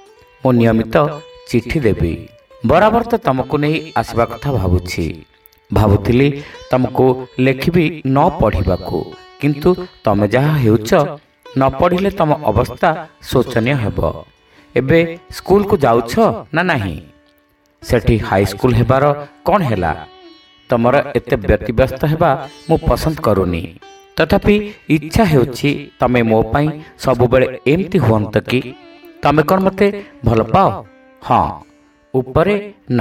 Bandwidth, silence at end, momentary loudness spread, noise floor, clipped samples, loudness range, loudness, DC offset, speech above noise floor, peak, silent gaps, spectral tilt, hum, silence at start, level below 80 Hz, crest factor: 16.5 kHz; 0 s; 9 LU; -56 dBFS; under 0.1%; 2 LU; -15 LUFS; under 0.1%; 41 dB; 0 dBFS; none; -7.5 dB/octave; none; 0.45 s; -32 dBFS; 16 dB